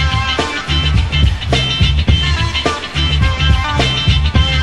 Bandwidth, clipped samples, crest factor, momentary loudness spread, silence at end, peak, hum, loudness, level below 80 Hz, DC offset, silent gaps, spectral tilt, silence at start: 11 kHz; under 0.1%; 12 dB; 3 LU; 0 s; 0 dBFS; none; -14 LUFS; -16 dBFS; 1%; none; -5 dB/octave; 0 s